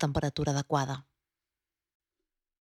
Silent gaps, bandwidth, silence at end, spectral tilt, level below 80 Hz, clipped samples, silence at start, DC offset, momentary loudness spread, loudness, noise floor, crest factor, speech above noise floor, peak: none; 12.5 kHz; 1.75 s; -5.5 dB/octave; -54 dBFS; under 0.1%; 0 s; under 0.1%; 7 LU; -31 LUFS; under -90 dBFS; 22 dB; over 60 dB; -14 dBFS